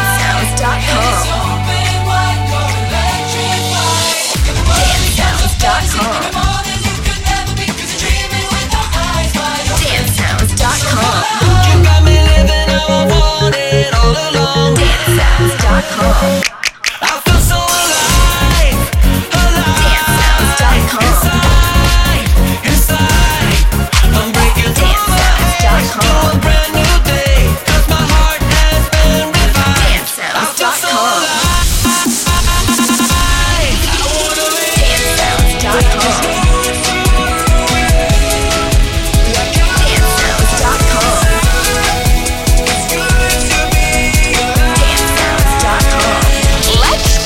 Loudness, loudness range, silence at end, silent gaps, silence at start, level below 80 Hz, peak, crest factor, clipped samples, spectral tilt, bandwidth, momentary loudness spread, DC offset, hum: -11 LUFS; 3 LU; 0 s; none; 0 s; -14 dBFS; 0 dBFS; 10 dB; under 0.1%; -3.5 dB/octave; 17 kHz; 4 LU; under 0.1%; none